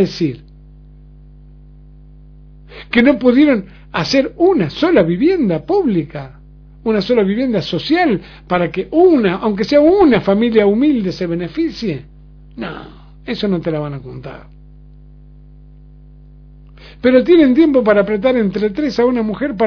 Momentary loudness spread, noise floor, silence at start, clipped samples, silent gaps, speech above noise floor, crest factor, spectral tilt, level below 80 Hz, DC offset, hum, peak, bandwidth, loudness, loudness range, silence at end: 17 LU; -40 dBFS; 0 s; under 0.1%; none; 26 dB; 16 dB; -7 dB/octave; -42 dBFS; under 0.1%; 50 Hz at -40 dBFS; 0 dBFS; 5.4 kHz; -14 LUFS; 12 LU; 0 s